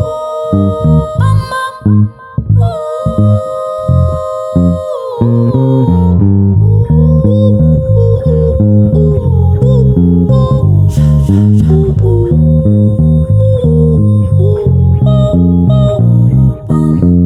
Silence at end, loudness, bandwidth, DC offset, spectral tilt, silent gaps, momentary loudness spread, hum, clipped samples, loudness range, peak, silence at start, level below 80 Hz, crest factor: 0 s; -9 LUFS; 11 kHz; under 0.1%; -10 dB/octave; none; 6 LU; none; under 0.1%; 4 LU; 0 dBFS; 0 s; -22 dBFS; 8 dB